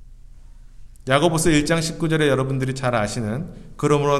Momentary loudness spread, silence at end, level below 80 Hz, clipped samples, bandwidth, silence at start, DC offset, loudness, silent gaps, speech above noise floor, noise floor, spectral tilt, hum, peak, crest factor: 10 LU; 0 s; -40 dBFS; under 0.1%; 15 kHz; 0 s; under 0.1%; -21 LUFS; none; 22 dB; -42 dBFS; -5 dB/octave; none; -2 dBFS; 18 dB